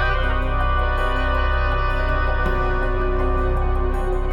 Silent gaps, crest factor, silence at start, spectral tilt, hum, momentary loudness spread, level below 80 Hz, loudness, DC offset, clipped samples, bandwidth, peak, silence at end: none; 12 dB; 0 s; -7.5 dB/octave; none; 2 LU; -20 dBFS; -22 LUFS; under 0.1%; under 0.1%; 5.4 kHz; -8 dBFS; 0 s